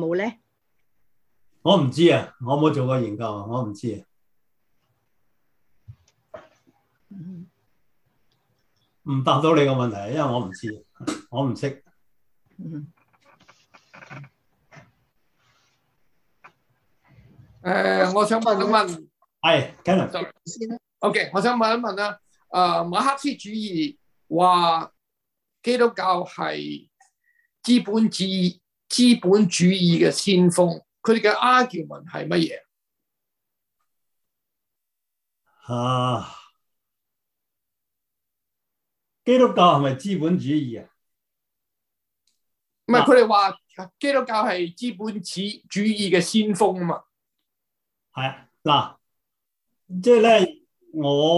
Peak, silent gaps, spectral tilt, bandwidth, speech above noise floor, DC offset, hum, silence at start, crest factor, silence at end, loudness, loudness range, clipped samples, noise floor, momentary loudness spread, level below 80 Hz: -2 dBFS; none; -5.5 dB/octave; 12.5 kHz; 63 dB; under 0.1%; none; 0 s; 22 dB; 0 s; -21 LUFS; 12 LU; under 0.1%; -83 dBFS; 18 LU; -66 dBFS